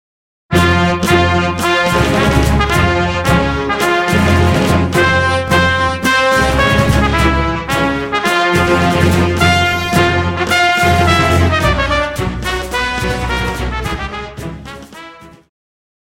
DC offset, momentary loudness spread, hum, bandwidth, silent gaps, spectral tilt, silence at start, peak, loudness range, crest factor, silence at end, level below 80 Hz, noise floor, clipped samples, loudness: under 0.1%; 8 LU; none; 17 kHz; none; -5 dB/octave; 0.5 s; 0 dBFS; 6 LU; 14 dB; 0.75 s; -24 dBFS; -36 dBFS; under 0.1%; -13 LUFS